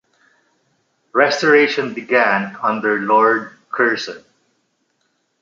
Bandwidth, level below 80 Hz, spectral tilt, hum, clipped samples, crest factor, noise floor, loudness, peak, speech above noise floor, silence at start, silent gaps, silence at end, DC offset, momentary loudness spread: 7.6 kHz; -70 dBFS; -4.5 dB/octave; none; under 0.1%; 18 dB; -67 dBFS; -16 LUFS; -2 dBFS; 51 dB; 1.15 s; none; 1.25 s; under 0.1%; 11 LU